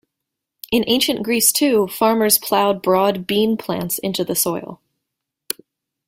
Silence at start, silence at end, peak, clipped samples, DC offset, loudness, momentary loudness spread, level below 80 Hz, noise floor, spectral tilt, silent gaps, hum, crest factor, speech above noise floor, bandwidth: 0.7 s; 1.3 s; 0 dBFS; under 0.1%; under 0.1%; -17 LUFS; 14 LU; -56 dBFS; -81 dBFS; -3 dB/octave; none; none; 20 dB; 63 dB; 16.5 kHz